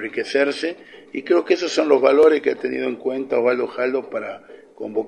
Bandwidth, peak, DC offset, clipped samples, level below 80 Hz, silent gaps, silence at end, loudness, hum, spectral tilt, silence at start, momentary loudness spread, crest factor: 9.6 kHz; -2 dBFS; under 0.1%; under 0.1%; -68 dBFS; none; 0 s; -20 LUFS; none; -4 dB/octave; 0 s; 18 LU; 18 dB